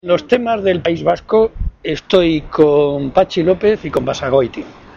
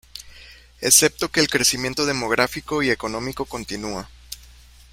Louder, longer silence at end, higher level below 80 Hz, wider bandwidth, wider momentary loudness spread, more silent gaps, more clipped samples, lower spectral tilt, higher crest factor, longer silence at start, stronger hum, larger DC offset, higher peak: first, -15 LUFS vs -20 LUFS; second, 0.25 s vs 0.4 s; first, -32 dBFS vs -48 dBFS; second, 7.4 kHz vs 16.5 kHz; second, 8 LU vs 24 LU; neither; neither; first, -6.5 dB/octave vs -2 dB/octave; second, 14 dB vs 24 dB; about the same, 0.05 s vs 0.15 s; neither; neither; about the same, 0 dBFS vs 0 dBFS